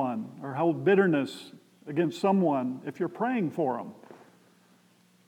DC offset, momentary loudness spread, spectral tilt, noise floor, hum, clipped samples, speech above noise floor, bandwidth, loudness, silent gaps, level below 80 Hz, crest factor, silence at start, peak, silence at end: under 0.1%; 15 LU; -7.5 dB/octave; -63 dBFS; none; under 0.1%; 36 dB; 13.5 kHz; -28 LUFS; none; under -90 dBFS; 18 dB; 0 s; -10 dBFS; 1.1 s